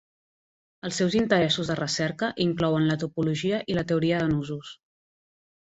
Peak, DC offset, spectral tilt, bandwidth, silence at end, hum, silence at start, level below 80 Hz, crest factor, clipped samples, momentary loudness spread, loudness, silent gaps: -6 dBFS; under 0.1%; -5.5 dB/octave; 8.2 kHz; 1.05 s; none; 0.85 s; -56 dBFS; 20 dB; under 0.1%; 10 LU; -25 LUFS; none